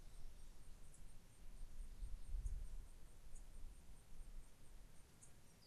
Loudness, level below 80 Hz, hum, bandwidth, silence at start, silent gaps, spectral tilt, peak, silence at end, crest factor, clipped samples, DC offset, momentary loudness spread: -61 LUFS; -54 dBFS; none; 13 kHz; 0 s; none; -4.5 dB/octave; -36 dBFS; 0 s; 16 dB; under 0.1%; under 0.1%; 13 LU